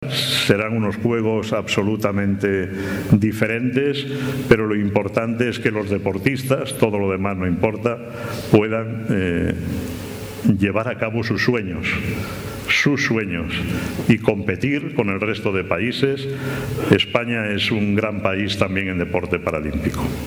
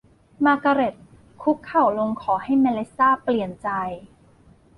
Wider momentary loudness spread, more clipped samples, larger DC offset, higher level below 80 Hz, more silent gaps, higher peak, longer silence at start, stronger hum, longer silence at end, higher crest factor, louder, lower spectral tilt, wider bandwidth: about the same, 7 LU vs 8 LU; neither; neither; first, -42 dBFS vs -58 dBFS; neither; first, 0 dBFS vs -6 dBFS; second, 0 s vs 0.4 s; neither; second, 0 s vs 0.75 s; about the same, 20 dB vs 16 dB; about the same, -20 LUFS vs -22 LUFS; second, -6 dB/octave vs -7.5 dB/octave; first, over 20 kHz vs 10.5 kHz